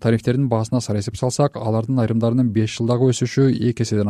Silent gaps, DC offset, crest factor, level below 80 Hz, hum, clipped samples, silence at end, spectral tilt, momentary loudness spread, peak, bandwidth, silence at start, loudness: none; under 0.1%; 14 dB; -50 dBFS; none; under 0.1%; 0 s; -7 dB/octave; 4 LU; -4 dBFS; 12 kHz; 0 s; -19 LUFS